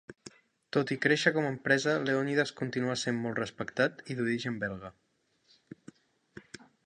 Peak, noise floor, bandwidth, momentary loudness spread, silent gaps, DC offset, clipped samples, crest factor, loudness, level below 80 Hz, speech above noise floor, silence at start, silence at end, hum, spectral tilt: -10 dBFS; -69 dBFS; 10 kHz; 23 LU; none; under 0.1%; under 0.1%; 22 dB; -30 LUFS; -70 dBFS; 39 dB; 0.1 s; 0.2 s; none; -5 dB/octave